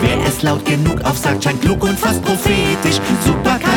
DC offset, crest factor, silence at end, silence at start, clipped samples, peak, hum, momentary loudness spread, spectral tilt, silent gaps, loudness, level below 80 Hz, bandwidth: under 0.1%; 14 dB; 0 s; 0 s; under 0.1%; -2 dBFS; none; 2 LU; -5 dB/octave; none; -15 LUFS; -30 dBFS; 19.5 kHz